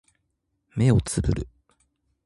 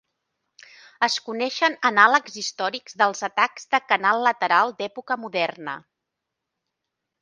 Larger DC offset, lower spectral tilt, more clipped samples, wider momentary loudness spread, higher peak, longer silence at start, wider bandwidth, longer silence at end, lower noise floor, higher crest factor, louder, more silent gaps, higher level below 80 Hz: neither; first, -6.5 dB/octave vs -2 dB/octave; neither; first, 15 LU vs 12 LU; second, -6 dBFS vs 0 dBFS; second, 0.75 s vs 1 s; first, 11.5 kHz vs 10 kHz; second, 0.8 s vs 1.45 s; second, -76 dBFS vs -83 dBFS; about the same, 20 dB vs 24 dB; about the same, -24 LUFS vs -22 LUFS; neither; first, -38 dBFS vs -80 dBFS